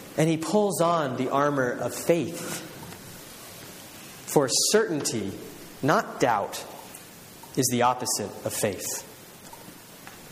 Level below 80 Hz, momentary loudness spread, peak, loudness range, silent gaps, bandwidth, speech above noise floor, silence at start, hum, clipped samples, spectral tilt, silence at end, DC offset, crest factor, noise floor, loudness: -64 dBFS; 21 LU; -6 dBFS; 3 LU; none; 15.5 kHz; 21 dB; 0 s; none; under 0.1%; -3.5 dB/octave; 0 s; under 0.1%; 22 dB; -46 dBFS; -26 LUFS